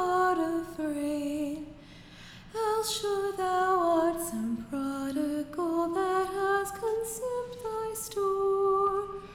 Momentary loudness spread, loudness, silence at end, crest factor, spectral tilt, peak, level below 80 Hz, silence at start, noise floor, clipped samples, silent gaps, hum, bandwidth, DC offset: 10 LU; -30 LUFS; 0 s; 14 dB; -4 dB/octave; -16 dBFS; -58 dBFS; 0 s; -50 dBFS; under 0.1%; none; none; 17.5 kHz; under 0.1%